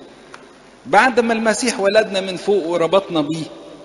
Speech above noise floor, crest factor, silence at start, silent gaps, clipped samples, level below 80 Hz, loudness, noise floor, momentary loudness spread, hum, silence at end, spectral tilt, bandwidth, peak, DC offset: 27 dB; 18 dB; 0 s; none; under 0.1%; -58 dBFS; -17 LUFS; -44 dBFS; 8 LU; none; 0 s; -4 dB/octave; 11.5 kHz; 0 dBFS; under 0.1%